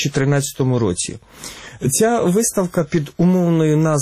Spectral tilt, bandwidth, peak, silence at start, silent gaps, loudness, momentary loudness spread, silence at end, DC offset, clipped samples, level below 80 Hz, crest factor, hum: -5.5 dB/octave; 15.5 kHz; -6 dBFS; 0 s; none; -17 LUFS; 13 LU; 0 s; under 0.1%; under 0.1%; -48 dBFS; 12 dB; none